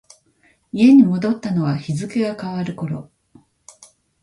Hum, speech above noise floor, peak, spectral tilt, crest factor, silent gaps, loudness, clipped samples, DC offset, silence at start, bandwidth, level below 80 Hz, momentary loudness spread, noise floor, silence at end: none; 42 dB; -2 dBFS; -7.5 dB/octave; 18 dB; none; -18 LUFS; under 0.1%; under 0.1%; 0.75 s; 11.5 kHz; -58 dBFS; 16 LU; -59 dBFS; 1.2 s